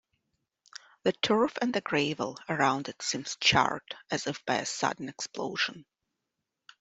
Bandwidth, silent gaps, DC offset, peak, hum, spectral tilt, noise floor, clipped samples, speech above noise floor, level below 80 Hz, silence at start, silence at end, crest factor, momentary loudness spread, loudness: 8.2 kHz; none; under 0.1%; -8 dBFS; none; -3 dB/octave; -85 dBFS; under 0.1%; 55 dB; -64 dBFS; 1.05 s; 1 s; 24 dB; 11 LU; -29 LUFS